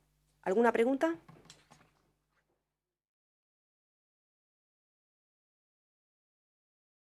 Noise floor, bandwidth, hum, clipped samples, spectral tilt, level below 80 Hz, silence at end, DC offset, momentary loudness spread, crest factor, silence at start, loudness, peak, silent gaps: -90 dBFS; 12.5 kHz; none; under 0.1%; -5.5 dB/octave; -80 dBFS; 5.9 s; under 0.1%; 13 LU; 26 dB; 0.45 s; -31 LUFS; -14 dBFS; none